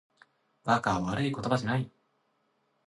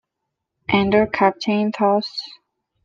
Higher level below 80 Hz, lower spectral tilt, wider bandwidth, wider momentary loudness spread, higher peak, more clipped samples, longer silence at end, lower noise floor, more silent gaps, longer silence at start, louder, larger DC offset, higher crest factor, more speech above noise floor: about the same, -58 dBFS vs -54 dBFS; about the same, -6 dB/octave vs -6.5 dB/octave; first, 11.5 kHz vs 7.2 kHz; second, 9 LU vs 15 LU; second, -12 dBFS vs -2 dBFS; neither; first, 1 s vs 0.5 s; second, -74 dBFS vs -80 dBFS; neither; about the same, 0.65 s vs 0.7 s; second, -30 LUFS vs -19 LUFS; neither; about the same, 22 dB vs 18 dB; second, 45 dB vs 61 dB